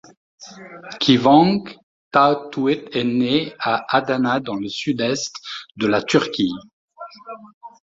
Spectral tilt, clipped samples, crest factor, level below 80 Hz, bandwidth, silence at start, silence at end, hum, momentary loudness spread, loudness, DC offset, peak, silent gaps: -5 dB/octave; under 0.1%; 18 dB; -60 dBFS; 7.8 kHz; 0.4 s; 0.15 s; none; 23 LU; -19 LUFS; under 0.1%; -2 dBFS; 1.83-2.11 s, 6.73-6.88 s, 7.54-7.61 s